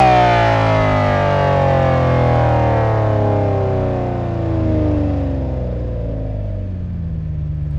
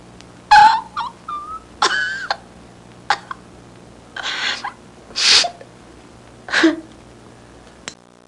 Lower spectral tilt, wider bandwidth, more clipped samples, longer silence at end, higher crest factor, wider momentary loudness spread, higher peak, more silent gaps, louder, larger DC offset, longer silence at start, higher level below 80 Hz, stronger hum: first, -8 dB/octave vs -1 dB/octave; second, 7.6 kHz vs 11.5 kHz; neither; second, 0 s vs 0.35 s; second, 14 dB vs 20 dB; second, 10 LU vs 24 LU; about the same, 0 dBFS vs 0 dBFS; neither; about the same, -17 LUFS vs -16 LUFS; neither; second, 0 s vs 0.5 s; first, -28 dBFS vs -52 dBFS; neither